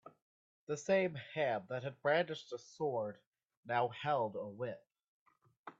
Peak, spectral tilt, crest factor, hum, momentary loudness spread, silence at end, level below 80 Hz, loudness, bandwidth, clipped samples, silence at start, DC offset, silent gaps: -20 dBFS; -5 dB/octave; 18 dB; none; 11 LU; 0.1 s; -82 dBFS; -38 LUFS; 8 kHz; under 0.1%; 0.05 s; under 0.1%; 0.22-0.67 s, 3.27-3.32 s, 3.57-3.63 s, 5.08-5.26 s, 5.57-5.64 s